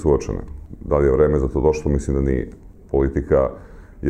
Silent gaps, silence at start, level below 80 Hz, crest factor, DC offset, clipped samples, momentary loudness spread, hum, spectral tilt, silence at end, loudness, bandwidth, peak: none; 0 s; -28 dBFS; 16 dB; under 0.1%; under 0.1%; 16 LU; none; -8.5 dB/octave; 0 s; -20 LUFS; 9.6 kHz; -4 dBFS